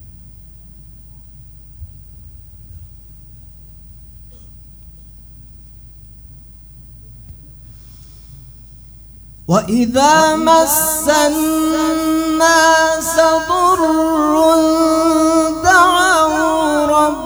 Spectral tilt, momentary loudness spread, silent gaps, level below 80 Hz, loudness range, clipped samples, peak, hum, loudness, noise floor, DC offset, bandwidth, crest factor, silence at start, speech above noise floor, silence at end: -3.5 dB/octave; 7 LU; none; -40 dBFS; 6 LU; under 0.1%; 0 dBFS; none; -12 LUFS; -37 dBFS; under 0.1%; over 20 kHz; 16 dB; 0 s; 25 dB; 0 s